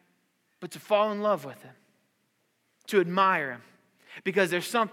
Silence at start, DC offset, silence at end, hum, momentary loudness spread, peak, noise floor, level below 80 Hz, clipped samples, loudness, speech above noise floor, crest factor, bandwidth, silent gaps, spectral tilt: 0.6 s; under 0.1%; 0 s; none; 20 LU; -10 dBFS; -73 dBFS; under -90 dBFS; under 0.1%; -27 LUFS; 46 dB; 20 dB; 17 kHz; none; -4.5 dB/octave